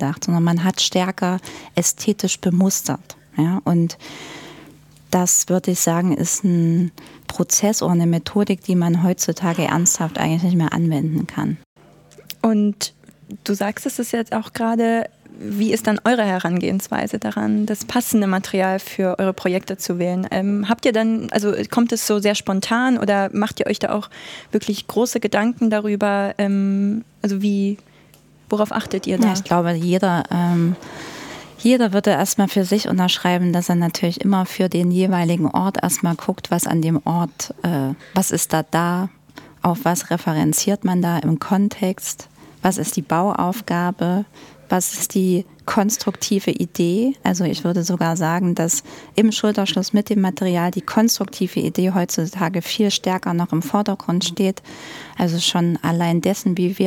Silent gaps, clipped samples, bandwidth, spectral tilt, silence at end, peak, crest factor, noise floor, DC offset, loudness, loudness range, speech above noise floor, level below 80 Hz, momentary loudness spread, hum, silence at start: 11.66-11.76 s; under 0.1%; 17.5 kHz; -5 dB/octave; 0 s; -2 dBFS; 16 dB; -50 dBFS; under 0.1%; -19 LUFS; 3 LU; 31 dB; -58 dBFS; 7 LU; none; 0 s